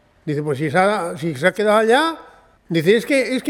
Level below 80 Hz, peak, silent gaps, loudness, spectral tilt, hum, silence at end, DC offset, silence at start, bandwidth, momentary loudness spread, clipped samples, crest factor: -58 dBFS; 0 dBFS; none; -18 LUFS; -5.5 dB/octave; none; 0 s; under 0.1%; 0.25 s; 17.5 kHz; 10 LU; under 0.1%; 18 dB